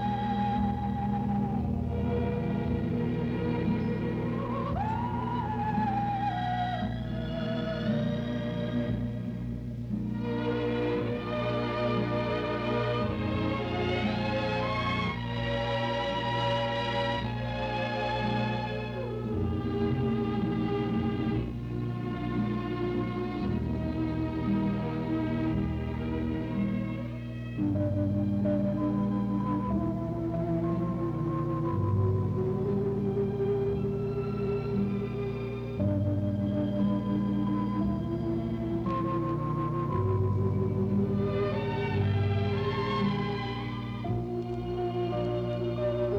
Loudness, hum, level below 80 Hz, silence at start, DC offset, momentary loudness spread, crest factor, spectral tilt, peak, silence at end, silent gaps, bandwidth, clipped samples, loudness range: -30 LUFS; 60 Hz at -45 dBFS; -44 dBFS; 0 s; under 0.1%; 5 LU; 14 dB; -8.5 dB/octave; -16 dBFS; 0 s; none; 7 kHz; under 0.1%; 2 LU